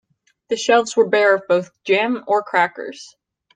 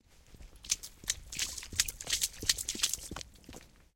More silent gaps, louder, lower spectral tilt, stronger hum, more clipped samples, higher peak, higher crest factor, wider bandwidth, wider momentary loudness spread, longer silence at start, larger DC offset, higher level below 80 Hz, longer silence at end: neither; first, -18 LUFS vs -33 LUFS; first, -3.5 dB/octave vs 0.5 dB/octave; neither; neither; first, -2 dBFS vs -6 dBFS; second, 16 dB vs 32 dB; second, 9.4 kHz vs 17 kHz; second, 13 LU vs 19 LU; first, 0.5 s vs 0.1 s; neither; second, -72 dBFS vs -54 dBFS; first, 0.5 s vs 0.15 s